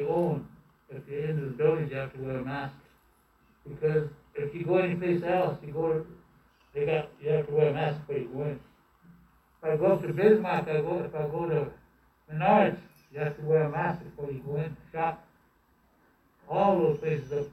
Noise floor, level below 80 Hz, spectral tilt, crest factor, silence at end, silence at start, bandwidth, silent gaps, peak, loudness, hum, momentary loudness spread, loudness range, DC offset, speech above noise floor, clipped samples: -66 dBFS; -62 dBFS; -9 dB/octave; 20 dB; 0 s; 0 s; 12.5 kHz; none; -10 dBFS; -29 LUFS; none; 14 LU; 5 LU; under 0.1%; 38 dB; under 0.1%